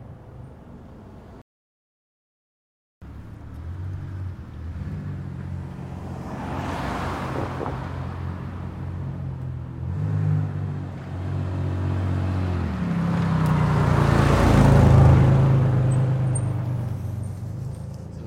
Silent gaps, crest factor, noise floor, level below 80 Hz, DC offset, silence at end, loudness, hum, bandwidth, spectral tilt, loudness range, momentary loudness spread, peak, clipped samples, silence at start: 1.42-3.01 s; 20 dB; -43 dBFS; -36 dBFS; under 0.1%; 0 s; -23 LUFS; none; 11.5 kHz; -8 dB/octave; 18 LU; 21 LU; -4 dBFS; under 0.1%; 0 s